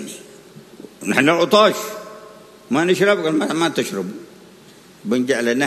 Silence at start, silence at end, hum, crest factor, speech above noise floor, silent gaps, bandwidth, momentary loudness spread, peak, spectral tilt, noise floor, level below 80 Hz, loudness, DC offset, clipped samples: 0 s; 0 s; none; 20 dB; 28 dB; none; 13.5 kHz; 20 LU; 0 dBFS; -4 dB/octave; -45 dBFS; -66 dBFS; -18 LUFS; under 0.1%; under 0.1%